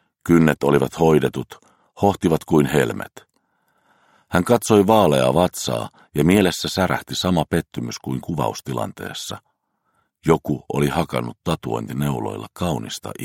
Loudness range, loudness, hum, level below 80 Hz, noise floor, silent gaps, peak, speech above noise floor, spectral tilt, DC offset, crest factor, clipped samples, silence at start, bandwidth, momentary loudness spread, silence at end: 7 LU; -20 LUFS; none; -46 dBFS; -69 dBFS; none; 0 dBFS; 49 dB; -5.5 dB/octave; under 0.1%; 20 dB; under 0.1%; 0.25 s; 16.5 kHz; 13 LU; 0 s